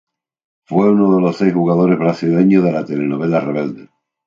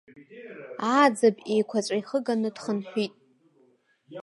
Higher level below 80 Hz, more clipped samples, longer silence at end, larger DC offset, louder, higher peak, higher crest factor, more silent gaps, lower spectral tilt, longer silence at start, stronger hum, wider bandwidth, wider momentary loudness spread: first, -60 dBFS vs -82 dBFS; neither; first, 0.45 s vs 0 s; neither; first, -15 LUFS vs -26 LUFS; first, 0 dBFS vs -6 dBFS; second, 14 dB vs 20 dB; neither; first, -9.5 dB/octave vs -5 dB/octave; first, 0.7 s vs 0.15 s; neither; second, 7.4 kHz vs 11.5 kHz; second, 8 LU vs 22 LU